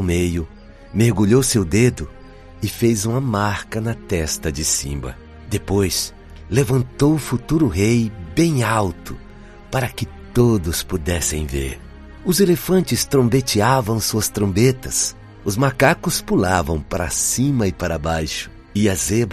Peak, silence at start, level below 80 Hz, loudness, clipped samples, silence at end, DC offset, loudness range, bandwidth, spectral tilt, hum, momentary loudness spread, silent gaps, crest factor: 0 dBFS; 0 s; -36 dBFS; -19 LUFS; under 0.1%; 0 s; under 0.1%; 4 LU; 13.5 kHz; -5 dB/octave; none; 11 LU; none; 18 dB